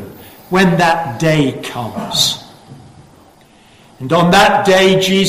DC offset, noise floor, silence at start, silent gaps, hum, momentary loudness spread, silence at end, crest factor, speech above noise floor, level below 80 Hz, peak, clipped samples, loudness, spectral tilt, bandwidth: under 0.1%; -45 dBFS; 0 s; none; none; 14 LU; 0 s; 14 dB; 33 dB; -46 dBFS; -2 dBFS; under 0.1%; -12 LUFS; -4.5 dB/octave; 16 kHz